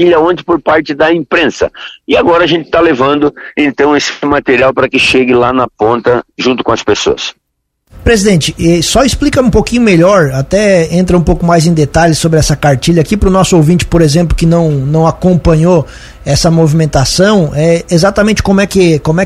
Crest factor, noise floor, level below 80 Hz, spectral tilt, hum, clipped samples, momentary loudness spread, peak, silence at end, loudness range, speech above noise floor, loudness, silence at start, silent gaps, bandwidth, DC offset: 8 dB; -63 dBFS; -24 dBFS; -5.5 dB/octave; none; 0.4%; 5 LU; 0 dBFS; 0 s; 2 LU; 55 dB; -9 LUFS; 0 s; none; 15 kHz; under 0.1%